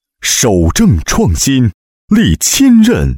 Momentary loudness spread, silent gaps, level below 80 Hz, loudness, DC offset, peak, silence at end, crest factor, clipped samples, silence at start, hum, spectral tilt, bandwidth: 6 LU; 1.74-2.08 s; -22 dBFS; -10 LUFS; under 0.1%; 0 dBFS; 0 s; 10 dB; under 0.1%; 0.2 s; none; -4.5 dB/octave; 17 kHz